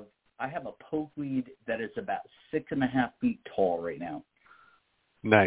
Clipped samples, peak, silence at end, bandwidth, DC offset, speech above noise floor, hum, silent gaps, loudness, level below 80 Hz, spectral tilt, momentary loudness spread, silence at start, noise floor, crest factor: under 0.1%; -4 dBFS; 0 s; 4 kHz; under 0.1%; 37 dB; none; none; -32 LUFS; -62 dBFS; -5 dB/octave; 10 LU; 0 s; -70 dBFS; 26 dB